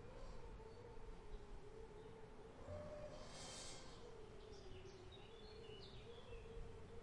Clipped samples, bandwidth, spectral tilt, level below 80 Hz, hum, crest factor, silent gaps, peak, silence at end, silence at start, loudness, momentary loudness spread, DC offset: under 0.1%; 11 kHz; -4.5 dB/octave; -60 dBFS; none; 14 dB; none; -42 dBFS; 0 s; 0 s; -58 LUFS; 6 LU; under 0.1%